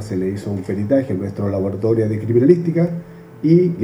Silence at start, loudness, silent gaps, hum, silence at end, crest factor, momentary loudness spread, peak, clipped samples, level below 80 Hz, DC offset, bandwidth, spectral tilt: 0 s; -18 LUFS; none; none; 0 s; 18 dB; 9 LU; 0 dBFS; under 0.1%; -54 dBFS; under 0.1%; 11 kHz; -9.5 dB/octave